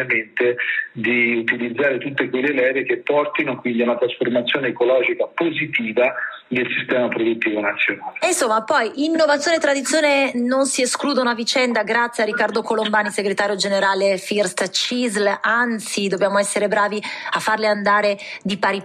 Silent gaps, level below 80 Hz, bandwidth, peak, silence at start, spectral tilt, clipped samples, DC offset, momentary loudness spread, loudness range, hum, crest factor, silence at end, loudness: none; -70 dBFS; 14 kHz; -6 dBFS; 0 s; -3 dB/octave; under 0.1%; under 0.1%; 4 LU; 2 LU; none; 14 dB; 0 s; -19 LUFS